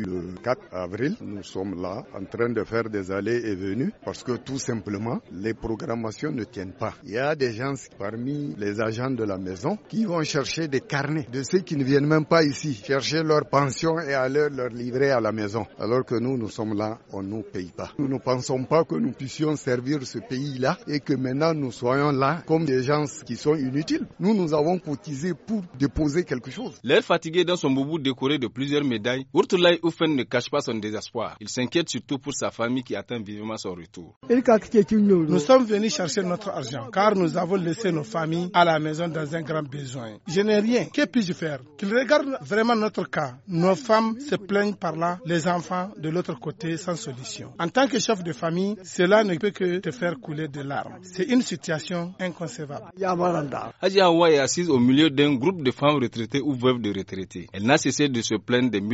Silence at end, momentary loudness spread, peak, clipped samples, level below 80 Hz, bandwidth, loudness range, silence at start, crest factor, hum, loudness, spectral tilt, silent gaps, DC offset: 0 s; 12 LU; -4 dBFS; under 0.1%; -56 dBFS; 8 kHz; 7 LU; 0 s; 22 dB; none; -25 LUFS; -4.5 dB/octave; 34.16-34.21 s; under 0.1%